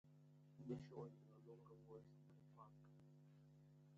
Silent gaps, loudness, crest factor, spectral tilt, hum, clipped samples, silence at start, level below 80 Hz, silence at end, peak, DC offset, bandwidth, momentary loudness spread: none; -61 LUFS; 22 dB; -8.5 dB/octave; 50 Hz at -75 dBFS; under 0.1%; 0.05 s; -88 dBFS; 0 s; -38 dBFS; under 0.1%; 7.6 kHz; 15 LU